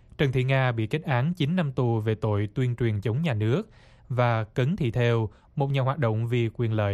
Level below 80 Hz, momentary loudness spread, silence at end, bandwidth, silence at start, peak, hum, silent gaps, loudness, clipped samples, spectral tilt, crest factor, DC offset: -52 dBFS; 4 LU; 0 s; 7.8 kHz; 0.2 s; -10 dBFS; none; none; -26 LUFS; under 0.1%; -8 dB/octave; 16 dB; under 0.1%